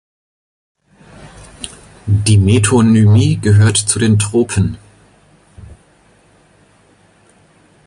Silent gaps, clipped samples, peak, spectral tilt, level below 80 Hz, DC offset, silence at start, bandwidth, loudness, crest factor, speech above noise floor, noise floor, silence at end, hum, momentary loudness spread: none; under 0.1%; 0 dBFS; -5.5 dB/octave; -34 dBFS; under 0.1%; 1.2 s; 11.5 kHz; -12 LUFS; 16 dB; 40 dB; -50 dBFS; 2.2 s; none; 20 LU